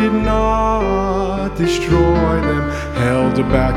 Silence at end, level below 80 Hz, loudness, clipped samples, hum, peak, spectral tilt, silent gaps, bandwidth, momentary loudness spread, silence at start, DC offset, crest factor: 0 s; -24 dBFS; -16 LUFS; under 0.1%; none; 0 dBFS; -7 dB/octave; none; 14 kHz; 5 LU; 0 s; under 0.1%; 16 dB